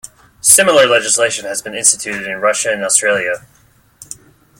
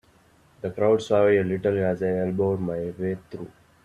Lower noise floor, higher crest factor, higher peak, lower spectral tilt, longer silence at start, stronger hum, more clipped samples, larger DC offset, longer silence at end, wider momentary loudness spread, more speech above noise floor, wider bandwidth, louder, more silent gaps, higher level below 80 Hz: second, -45 dBFS vs -58 dBFS; about the same, 16 dB vs 16 dB; first, 0 dBFS vs -8 dBFS; second, -0.5 dB/octave vs -7.5 dB/octave; second, 0.45 s vs 0.65 s; neither; first, 0.1% vs under 0.1%; neither; first, 0.55 s vs 0.4 s; first, 20 LU vs 15 LU; about the same, 32 dB vs 35 dB; first, 17 kHz vs 10.5 kHz; first, -12 LUFS vs -24 LUFS; neither; about the same, -56 dBFS vs -58 dBFS